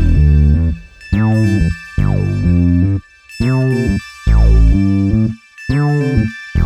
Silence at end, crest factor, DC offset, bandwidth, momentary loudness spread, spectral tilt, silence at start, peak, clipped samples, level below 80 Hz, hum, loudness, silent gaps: 0 s; 12 dB; under 0.1%; 9.4 kHz; 9 LU; -8.5 dB/octave; 0 s; -2 dBFS; under 0.1%; -16 dBFS; none; -14 LUFS; none